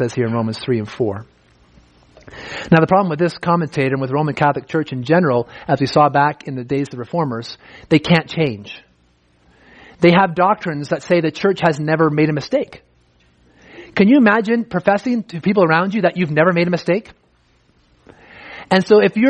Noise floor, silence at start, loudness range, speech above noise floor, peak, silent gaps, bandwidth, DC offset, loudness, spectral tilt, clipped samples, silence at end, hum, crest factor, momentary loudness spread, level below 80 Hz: -57 dBFS; 0 s; 3 LU; 41 dB; 0 dBFS; none; 9.4 kHz; under 0.1%; -17 LUFS; -7 dB/octave; under 0.1%; 0 s; none; 18 dB; 11 LU; -54 dBFS